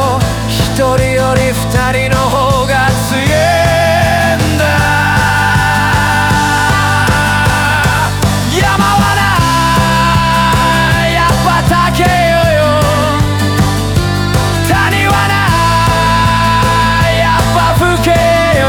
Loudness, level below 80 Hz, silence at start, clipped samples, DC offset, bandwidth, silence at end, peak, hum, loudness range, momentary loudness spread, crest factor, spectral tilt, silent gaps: -10 LUFS; -22 dBFS; 0 s; under 0.1%; under 0.1%; over 20 kHz; 0 s; 0 dBFS; none; 1 LU; 3 LU; 10 dB; -5 dB/octave; none